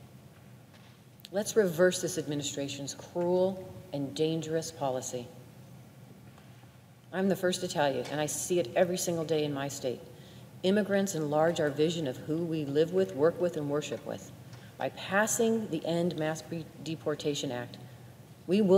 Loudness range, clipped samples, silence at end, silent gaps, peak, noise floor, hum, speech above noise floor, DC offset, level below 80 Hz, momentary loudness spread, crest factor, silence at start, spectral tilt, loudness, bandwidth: 5 LU; under 0.1%; 0 s; none; -12 dBFS; -54 dBFS; none; 24 dB; under 0.1%; -70 dBFS; 19 LU; 20 dB; 0 s; -4.5 dB/octave; -31 LUFS; 16 kHz